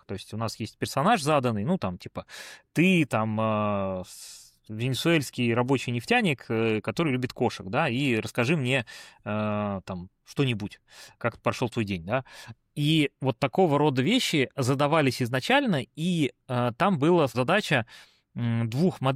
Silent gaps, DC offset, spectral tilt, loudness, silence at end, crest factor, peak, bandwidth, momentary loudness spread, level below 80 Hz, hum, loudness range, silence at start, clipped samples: none; under 0.1%; -5.5 dB/octave; -26 LUFS; 0 s; 16 dB; -10 dBFS; 15.5 kHz; 15 LU; -62 dBFS; none; 5 LU; 0.1 s; under 0.1%